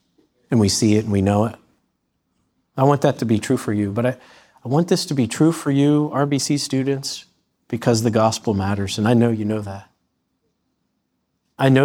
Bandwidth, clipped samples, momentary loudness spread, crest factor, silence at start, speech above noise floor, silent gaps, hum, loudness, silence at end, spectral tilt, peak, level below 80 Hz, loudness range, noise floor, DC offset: 17 kHz; under 0.1%; 9 LU; 18 dB; 0.5 s; 54 dB; none; none; -19 LUFS; 0 s; -6 dB/octave; -2 dBFS; -58 dBFS; 2 LU; -72 dBFS; under 0.1%